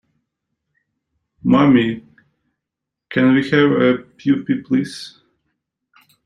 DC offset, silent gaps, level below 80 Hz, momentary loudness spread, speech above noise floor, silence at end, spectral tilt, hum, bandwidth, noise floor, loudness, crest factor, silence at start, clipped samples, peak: under 0.1%; none; -56 dBFS; 15 LU; 67 dB; 1.15 s; -7 dB/octave; none; 11 kHz; -83 dBFS; -16 LUFS; 18 dB; 1.45 s; under 0.1%; -2 dBFS